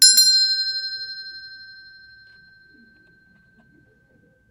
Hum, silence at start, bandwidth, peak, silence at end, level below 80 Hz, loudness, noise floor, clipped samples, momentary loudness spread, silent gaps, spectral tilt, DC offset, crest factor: none; 0 s; 15.5 kHz; 0 dBFS; 2.85 s; -70 dBFS; -16 LUFS; -58 dBFS; under 0.1%; 28 LU; none; 4.5 dB/octave; under 0.1%; 24 dB